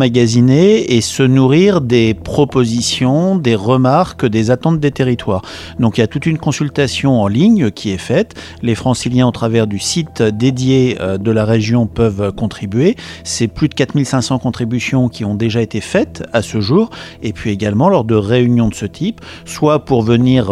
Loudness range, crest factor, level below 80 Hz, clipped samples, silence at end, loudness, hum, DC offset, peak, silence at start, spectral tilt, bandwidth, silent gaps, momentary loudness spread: 4 LU; 14 dB; -40 dBFS; under 0.1%; 0 s; -14 LUFS; none; under 0.1%; 0 dBFS; 0 s; -6 dB/octave; 13 kHz; none; 8 LU